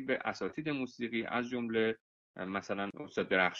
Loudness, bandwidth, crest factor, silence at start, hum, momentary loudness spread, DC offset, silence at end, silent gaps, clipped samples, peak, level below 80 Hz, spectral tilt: -36 LUFS; 7.6 kHz; 20 dB; 0 s; none; 7 LU; under 0.1%; 0 s; 2.00-2.34 s; under 0.1%; -16 dBFS; -70 dBFS; -5.5 dB/octave